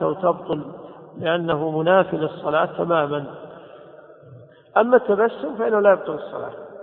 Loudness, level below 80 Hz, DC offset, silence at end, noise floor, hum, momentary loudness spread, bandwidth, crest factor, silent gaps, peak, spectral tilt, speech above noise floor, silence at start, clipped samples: -21 LUFS; -62 dBFS; under 0.1%; 0 s; -45 dBFS; none; 18 LU; 4.1 kHz; 20 dB; none; -2 dBFS; -10.5 dB/octave; 25 dB; 0 s; under 0.1%